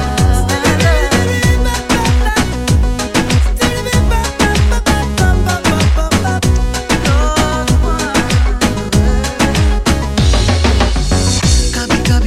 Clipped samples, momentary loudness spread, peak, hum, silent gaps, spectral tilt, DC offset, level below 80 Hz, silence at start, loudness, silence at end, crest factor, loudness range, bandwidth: under 0.1%; 3 LU; 0 dBFS; none; none; -4.5 dB/octave; under 0.1%; -16 dBFS; 0 s; -13 LUFS; 0 s; 12 dB; 1 LU; 15.5 kHz